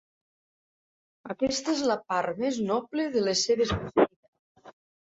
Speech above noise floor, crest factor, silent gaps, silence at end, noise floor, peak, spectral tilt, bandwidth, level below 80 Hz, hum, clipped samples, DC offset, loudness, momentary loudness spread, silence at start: over 63 dB; 22 dB; 4.16-4.33 s, 4.39-4.55 s; 0.4 s; under -90 dBFS; -6 dBFS; -4 dB/octave; 8 kHz; -54 dBFS; none; under 0.1%; under 0.1%; -27 LUFS; 5 LU; 1.25 s